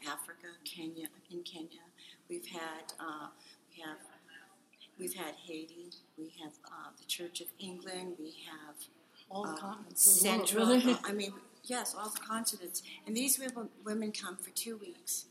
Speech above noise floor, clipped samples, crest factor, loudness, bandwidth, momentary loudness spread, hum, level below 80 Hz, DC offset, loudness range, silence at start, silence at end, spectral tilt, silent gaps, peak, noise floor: 26 dB; under 0.1%; 26 dB; -33 LUFS; 15.5 kHz; 22 LU; none; under -90 dBFS; under 0.1%; 18 LU; 0 s; 0.05 s; -2 dB/octave; none; -10 dBFS; -62 dBFS